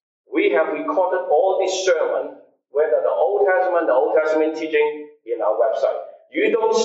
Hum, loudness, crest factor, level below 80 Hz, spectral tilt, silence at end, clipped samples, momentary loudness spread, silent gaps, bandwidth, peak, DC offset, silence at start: none; -20 LUFS; 14 dB; -76 dBFS; -2.5 dB/octave; 0 s; under 0.1%; 9 LU; none; 8 kHz; -6 dBFS; under 0.1%; 0.3 s